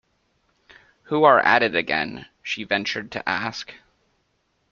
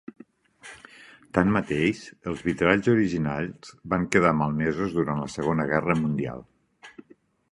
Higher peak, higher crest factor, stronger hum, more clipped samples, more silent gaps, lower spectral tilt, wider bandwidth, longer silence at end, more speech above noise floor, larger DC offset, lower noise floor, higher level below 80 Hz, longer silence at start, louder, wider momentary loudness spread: about the same, -2 dBFS vs -2 dBFS; about the same, 22 dB vs 24 dB; neither; neither; neither; second, -4.5 dB/octave vs -7 dB/octave; second, 7.4 kHz vs 11.5 kHz; first, 0.95 s vs 0.6 s; first, 48 dB vs 34 dB; neither; first, -70 dBFS vs -58 dBFS; second, -62 dBFS vs -50 dBFS; first, 1.1 s vs 0.65 s; first, -21 LUFS vs -25 LUFS; second, 16 LU vs 21 LU